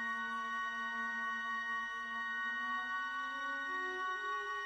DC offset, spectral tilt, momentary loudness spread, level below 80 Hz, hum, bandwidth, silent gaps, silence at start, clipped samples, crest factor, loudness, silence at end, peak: under 0.1%; -1.5 dB/octave; 2 LU; -78 dBFS; none; 11 kHz; none; 0 s; under 0.1%; 10 dB; -38 LUFS; 0 s; -30 dBFS